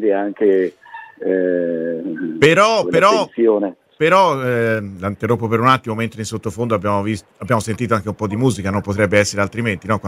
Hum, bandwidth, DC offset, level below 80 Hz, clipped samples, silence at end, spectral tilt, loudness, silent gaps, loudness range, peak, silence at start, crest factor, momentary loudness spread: none; 15.5 kHz; under 0.1%; -56 dBFS; under 0.1%; 0 s; -5.5 dB/octave; -17 LUFS; none; 4 LU; 0 dBFS; 0 s; 18 dB; 11 LU